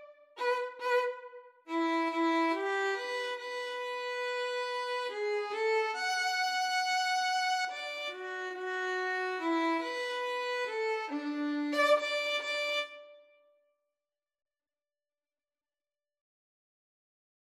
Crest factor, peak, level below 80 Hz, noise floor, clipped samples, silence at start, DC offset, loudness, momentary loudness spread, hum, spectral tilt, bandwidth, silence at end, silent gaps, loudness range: 18 dB; -16 dBFS; under -90 dBFS; under -90 dBFS; under 0.1%; 0 s; under 0.1%; -32 LUFS; 8 LU; none; 0 dB/octave; 15.5 kHz; 4.3 s; none; 3 LU